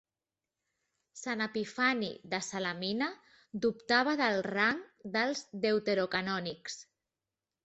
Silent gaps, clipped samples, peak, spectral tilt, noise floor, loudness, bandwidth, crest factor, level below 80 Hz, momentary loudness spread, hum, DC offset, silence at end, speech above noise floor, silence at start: none; under 0.1%; -14 dBFS; -4 dB/octave; under -90 dBFS; -32 LUFS; 8.2 kHz; 20 dB; -74 dBFS; 12 LU; none; under 0.1%; 0.8 s; over 57 dB; 1.15 s